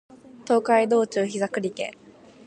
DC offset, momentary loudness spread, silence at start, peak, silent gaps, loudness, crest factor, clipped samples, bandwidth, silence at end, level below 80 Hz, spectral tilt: under 0.1%; 14 LU; 0.35 s; -6 dBFS; none; -24 LUFS; 18 dB; under 0.1%; 9.6 kHz; 0.55 s; -72 dBFS; -5 dB/octave